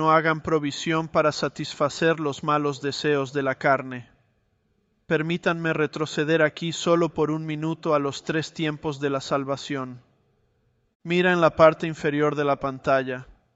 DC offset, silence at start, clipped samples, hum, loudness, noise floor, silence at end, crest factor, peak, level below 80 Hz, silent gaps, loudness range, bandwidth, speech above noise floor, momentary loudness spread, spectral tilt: under 0.1%; 0 s; under 0.1%; none; -24 LUFS; -69 dBFS; 0.3 s; 22 dB; -2 dBFS; -60 dBFS; 10.95-11.00 s; 4 LU; 8.2 kHz; 45 dB; 9 LU; -5.5 dB/octave